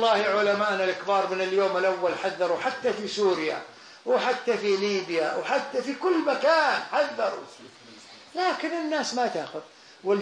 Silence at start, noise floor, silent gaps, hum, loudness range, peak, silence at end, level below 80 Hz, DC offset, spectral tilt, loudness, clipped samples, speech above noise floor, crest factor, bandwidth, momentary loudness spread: 0 s; -48 dBFS; none; none; 2 LU; -10 dBFS; 0 s; -78 dBFS; under 0.1%; -3.5 dB/octave; -26 LUFS; under 0.1%; 23 dB; 16 dB; 10.5 kHz; 13 LU